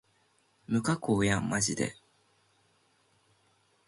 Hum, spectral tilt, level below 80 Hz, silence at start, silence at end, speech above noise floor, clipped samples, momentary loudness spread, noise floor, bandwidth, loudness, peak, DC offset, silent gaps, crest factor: none; -4.5 dB/octave; -58 dBFS; 0.7 s; 1.95 s; 41 dB; under 0.1%; 6 LU; -70 dBFS; 11.5 kHz; -30 LUFS; -12 dBFS; under 0.1%; none; 22 dB